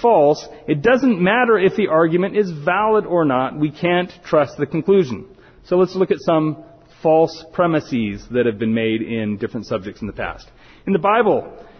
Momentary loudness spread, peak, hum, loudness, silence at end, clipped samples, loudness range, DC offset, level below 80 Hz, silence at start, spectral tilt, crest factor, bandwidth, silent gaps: 10 LU; -4 dBFS; none; -18 LUFS; 0.15 s; under 0.1%; 5 LU; under 0.1%; -50 dBFS; 0 s; -7.5 dB/octave; 14 dB; 6.6 kHz; none